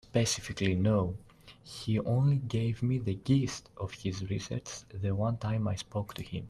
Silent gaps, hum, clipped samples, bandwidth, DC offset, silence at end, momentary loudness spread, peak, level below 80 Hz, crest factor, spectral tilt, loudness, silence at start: none; none; under 0.1%; 13 kHz; under 0.1%; 0 s; 11 LU; -14 dBFS; -56 dBFS; 18 dB; -6 dB/octave; -32 LUFS; 0.15 s